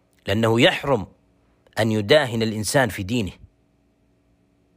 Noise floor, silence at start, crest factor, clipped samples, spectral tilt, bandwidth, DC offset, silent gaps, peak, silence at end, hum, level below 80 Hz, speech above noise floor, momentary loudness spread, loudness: -62 dBFS; 0.25 s; 20 dB; under 0.1%; -5 dB/octave; 16 kHz; under 0.1%; none; -4 dBFS; 1.45 s; none; -52 dBFS; 42 dB; 10 LU; -21 LUFS